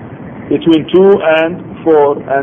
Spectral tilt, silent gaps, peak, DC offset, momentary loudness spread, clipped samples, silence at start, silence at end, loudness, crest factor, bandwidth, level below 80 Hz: -8.5 dB/octave; none; 0 dBFS; under 0.1%; 10 LU; under 0.1%; 0 s; 0 s; -10 LUFS; 10 dB; 3.8 kHz; -48 dBFS